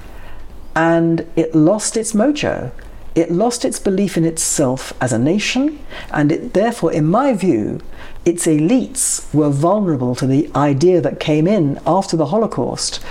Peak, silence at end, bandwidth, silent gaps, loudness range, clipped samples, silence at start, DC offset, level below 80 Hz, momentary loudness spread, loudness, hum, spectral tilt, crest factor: -4 dBFS; 0 s; 16 kHz; none; 2 LU; under 0.1%; 0 s; under 0.1%; -38 dBFS; 7 LU; -16 LUFS; none; -5 dB/octave; 12 dB